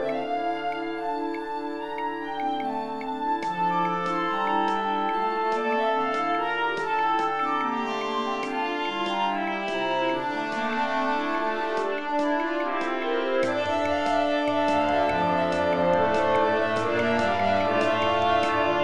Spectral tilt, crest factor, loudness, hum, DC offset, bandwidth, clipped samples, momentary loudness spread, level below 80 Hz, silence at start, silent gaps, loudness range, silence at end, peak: -5 dB/octave; 14 dB; -25 LUFS; none; 0.6%; 11.5 kHz; under 0.1%; 7 LU; -56 dBFS; 0 s; none; 4 LU; 0 s; -10 dBFS